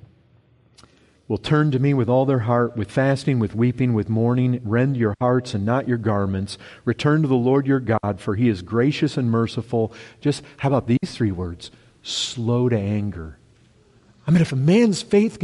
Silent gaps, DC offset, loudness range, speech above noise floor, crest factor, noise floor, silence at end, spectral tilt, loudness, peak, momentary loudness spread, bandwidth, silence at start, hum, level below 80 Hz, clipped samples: none; under 0.1%; 4 LU; 36 dB; 16 dB; -56 dBFS; 0 s; -7 dB/octave; -21 LUFS; -6 dBFS; 10 LU; 11.5 kHz; 1.3 s; none; -52 dBFS; under 0.1%